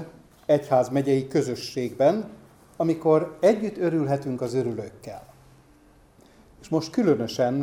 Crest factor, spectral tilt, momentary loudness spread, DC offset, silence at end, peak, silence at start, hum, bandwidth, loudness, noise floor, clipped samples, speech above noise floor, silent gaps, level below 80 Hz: 18 dB; -7 dB/octave; 16 LU; under 0.1%; 0 s; -8 dBFS; 0 s; none; 16 kHz; -24 LUFS; -55 dBFS; under 0.1%; 32 dB; none; -62 dBFS